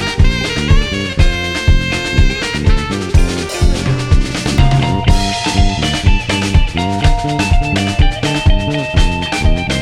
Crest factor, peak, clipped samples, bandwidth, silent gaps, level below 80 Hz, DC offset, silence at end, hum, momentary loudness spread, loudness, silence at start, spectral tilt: 12 dB; 0 dBFS; under 0.1%; 12 kHz; none; -14 dBFS; under 0.1%; 0 s; none; 2 LU; -14 LUFS; 0 s; -5 dB/octave